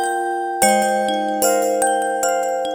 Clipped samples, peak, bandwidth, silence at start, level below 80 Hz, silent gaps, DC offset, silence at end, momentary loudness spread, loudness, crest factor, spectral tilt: under 0.1%; -2 dBFS; over 20 kHz; 0 s; -62 dBFS; none; under 0.1%; 0 s; 5 LU; -18 LUFS; 18 dB; -2 dB/octave